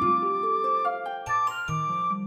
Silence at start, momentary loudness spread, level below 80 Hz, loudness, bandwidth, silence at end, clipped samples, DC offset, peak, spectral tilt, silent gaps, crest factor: 0 s; 5 LU; -60 dBFS; -26 LUFS; 15 kHz; 0 s; under 0.1%; under 0.1%; -14 dBFS; -5.5 dB/octave; none; 12 dB